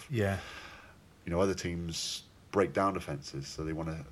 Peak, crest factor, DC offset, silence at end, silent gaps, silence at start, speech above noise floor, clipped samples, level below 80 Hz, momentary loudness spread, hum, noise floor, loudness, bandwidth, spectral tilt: -14 dBFS; 20 dB; under 0.1%; 0 s; none; 0 s; 23 dB; under 0.1%; -54 dBFS; 16 LU; none; -56 dBFS; -34 LUFS; 14.5 kHz; -5 dB/octave